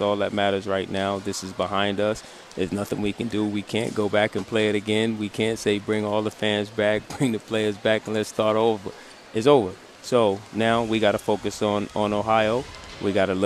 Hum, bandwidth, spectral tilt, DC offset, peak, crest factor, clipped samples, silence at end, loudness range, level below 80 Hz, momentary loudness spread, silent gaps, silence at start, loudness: none; 14.5 kHz; -5 dB/octave; under 0.1%; -4 dBFS; 20 dB; under 0.1%; 0 s; 3 LU; -56 dBFS; 8 LU; none; 0 s; -24 LUFS